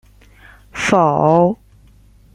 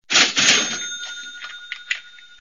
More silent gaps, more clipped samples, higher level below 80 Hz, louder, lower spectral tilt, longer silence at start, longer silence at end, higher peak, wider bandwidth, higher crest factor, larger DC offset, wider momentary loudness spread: neither; neither; first, -48 dBFS vs -70 dBFS; first, -15 LUFS vs -18 LUFS; first, -6 dB/octave vs 0.5 dB/octave; first, 0.75 s vs 0.1 s; first, 0.8 s vs 0.15 s; about the same, -2 dBFS vs 0 dBFS; second, 11.5 kHz vs 15 kHz; second, 16 dB vs 22 dB; second, under 0.1% vs 0.3%; second, 17 LU vs 20 LU